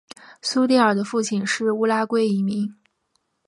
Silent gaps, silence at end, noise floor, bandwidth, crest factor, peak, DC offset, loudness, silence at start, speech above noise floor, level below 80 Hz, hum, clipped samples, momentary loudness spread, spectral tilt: none; 0.75 s; -71 dBFS; 11.5 kHz; 18 dB; -4 dBFS; under 0.1%; -21 LUFS; 0.3 s; 51 dB; -72 dBFS; none; under 0.1%; 9 LU; -4.5 dB/octave